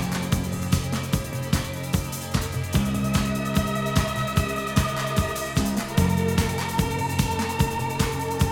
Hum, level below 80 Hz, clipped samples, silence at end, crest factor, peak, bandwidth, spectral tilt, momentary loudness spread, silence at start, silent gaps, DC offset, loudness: none; -36 dBFS; under 0.1%; 0 s; 18 dB; -6 dBFS; 19 kHz; -5 dB/octave; 4 LU; 0 s; none; under 0.1%; -25 LUFS